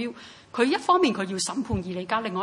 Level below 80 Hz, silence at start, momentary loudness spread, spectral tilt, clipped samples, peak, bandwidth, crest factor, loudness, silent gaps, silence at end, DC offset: -54 dBFS; 0 s; 14 LU; -4.5 dB/octave; under 0.1%; -6 dBFS; 11.5 kHz; 18 dB; -25 LUFS; none; 0 s; under 0.1%